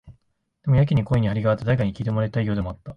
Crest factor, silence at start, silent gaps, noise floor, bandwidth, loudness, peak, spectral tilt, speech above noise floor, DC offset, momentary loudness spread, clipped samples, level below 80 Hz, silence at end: 14 dB; 0.05 s; none; -67 dBFS; 5.6 kHz; -22 LUFS; -8 dBFS; -9.5 dB/octave; 45 dB; under 0.1%; 6 LU; under 0.1%; -42 dBFS; 0 s